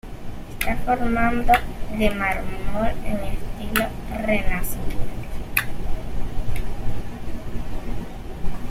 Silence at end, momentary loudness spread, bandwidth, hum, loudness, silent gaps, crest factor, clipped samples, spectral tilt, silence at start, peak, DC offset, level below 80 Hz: 0 s; 14 LU; 16 kHz; none; -26 LUFS; none; 18 dB; under 0.1%; -5.5 dB/octave; 0.05 s; -2 dBFS; under 0.1%; -28 dBFS